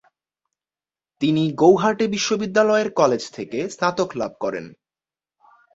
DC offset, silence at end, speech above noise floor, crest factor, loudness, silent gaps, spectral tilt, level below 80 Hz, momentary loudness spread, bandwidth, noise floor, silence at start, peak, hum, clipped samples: under 0.1%; 1.05 s; over 70 dB; 20 dB; -20 LUFS; none; -5 dB/octave; -62 dBFS; 12 LU; 8 kHz; under -90 dBFS; 1.2 s; -2 dBFS; none; under 0.1%